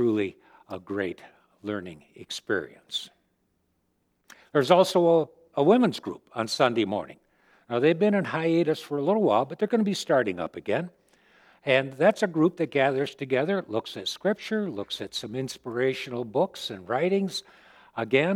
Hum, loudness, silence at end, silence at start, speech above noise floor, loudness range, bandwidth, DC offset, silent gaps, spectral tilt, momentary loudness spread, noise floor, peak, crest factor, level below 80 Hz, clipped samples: none; -26 LUFS; 0 s; 0 s; 47 dB; 9 LU; 16 kHz; under 0.1%; none; -5.5 dB/octave; 14 LU; -73 dBFS; -4 dBFS; 24 dB; -72 dBFS; under 0.1%